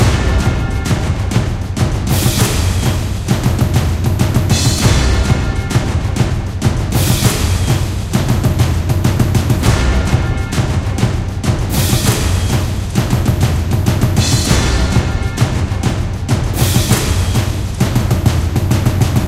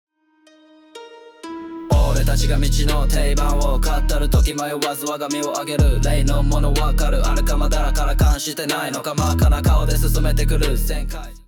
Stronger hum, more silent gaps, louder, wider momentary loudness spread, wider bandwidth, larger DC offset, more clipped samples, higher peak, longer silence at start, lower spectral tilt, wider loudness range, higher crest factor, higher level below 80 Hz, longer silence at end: neither; neither; first, -15 LUFS vs -20 LUFS; about the same, 5 LU vs 7 LU; second, 16 kHz vs 19.5 kHz; neither; neither; first, 0 dBFS vs -6 dBFS; second, 0 s vs 0.95 s; about the same, -5 dB/octave vs -5 dB/octave; about the same, 1 LU vs 2 LU; about the same, 14 dB vs 12 dB; about the same, -20 dBFS vs -18 dBFS; about the same, 0 s vs 0.1 s